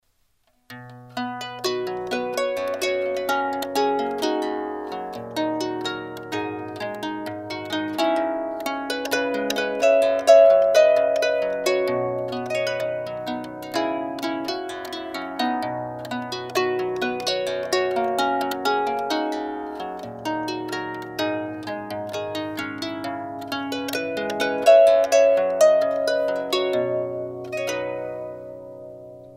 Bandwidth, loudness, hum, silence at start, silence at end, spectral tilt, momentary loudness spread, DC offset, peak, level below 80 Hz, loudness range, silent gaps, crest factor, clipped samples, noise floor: 16 kHz; -23 LUFS; none; 0.7 s; 0 s; -4 dB/octave; 14 LU; under 0.1%; -2 dBFS; -64 dBFS; 10 LU; none; 20 dB; under 0.1%; -65 dBFS